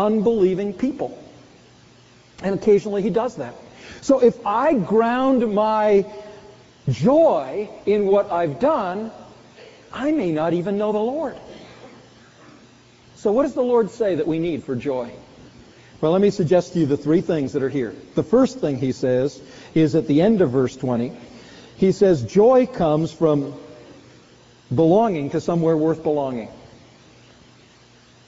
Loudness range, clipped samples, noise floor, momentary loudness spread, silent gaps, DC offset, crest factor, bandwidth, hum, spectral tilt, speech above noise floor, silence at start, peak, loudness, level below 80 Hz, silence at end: 5 LU; under 0.1%; -51 dBFS; 14 LU; none; under 0.1%; 16 dB; 8 kHz; none; -7 dB/octave; 32 dB; 0 s; -4 dBFS; -20 LUFS; -54 dBFS; 1.7 s